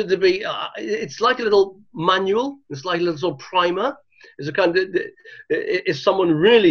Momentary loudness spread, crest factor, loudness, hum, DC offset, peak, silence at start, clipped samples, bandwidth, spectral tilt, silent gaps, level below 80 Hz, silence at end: 9 LU; 18 dB; -20 LUFS; none; under 0.1%; -2 dBFS; 0 s; under 0.1%; 6.8 kHz; -5.5 dB/octave; none; -60 dBFS; 0 s